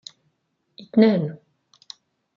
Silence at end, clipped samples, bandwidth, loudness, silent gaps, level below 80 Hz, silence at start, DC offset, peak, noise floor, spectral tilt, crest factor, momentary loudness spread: 1 s; under 0.1%; 7.2 kHz; -20 LUFS; none; -72 dBFS; 0.95 s; under 0.1%; -4 dBFS; -71 dBFS; -7.5 dB/octave; 22 dB; 26 LU